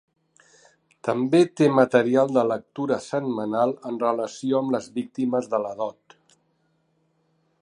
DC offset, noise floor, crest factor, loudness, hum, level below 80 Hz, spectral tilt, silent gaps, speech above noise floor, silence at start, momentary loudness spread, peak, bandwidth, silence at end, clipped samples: under 0.1%; -69 dBFS; 20 dB; -23 LUFS; none; -74 dBFS; -6.5 dB/octave; none; 46 dB; 1.05 s; 10 LU; -4 dBFS; 10.5 kHz; 1.7 s; under 0.1%